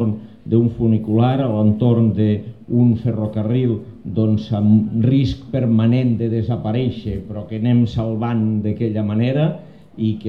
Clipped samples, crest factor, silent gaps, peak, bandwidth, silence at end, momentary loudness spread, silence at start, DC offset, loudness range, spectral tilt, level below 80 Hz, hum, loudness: under 0.1%; 14 dB; none; -4 dBFS; 5.6 kHz; 0 s; 8 LU; 0 s; 0.4%; 3 LU; -10.5 dB/octave; -44 dBFS; none; -18 LUFS